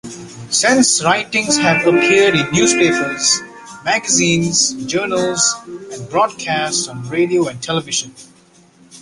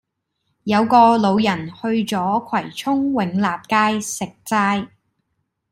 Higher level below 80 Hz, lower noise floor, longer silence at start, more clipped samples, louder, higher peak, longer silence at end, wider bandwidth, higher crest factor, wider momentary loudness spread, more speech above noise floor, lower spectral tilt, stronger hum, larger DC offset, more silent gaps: first, -54 dBFS vs -60 dBFS; second, -49 dBFS vs -73 dBFS; second, 0.05 s vs 0.65 s; neither; first, -15 LUFS vs -19 LUFS; about the same, 0 dBFS vs -2 dBFS; second, 0 s vs 0.85 s; second, 11.5 kHz vs 16 kHz; about the same, 16 dB vs 18 dB; about the same, 10 LU vs 12 LU; second, 33 dB vs 55 dB; second, -2.5 dB/octave vs -5 dB/octave; neither; neither; neither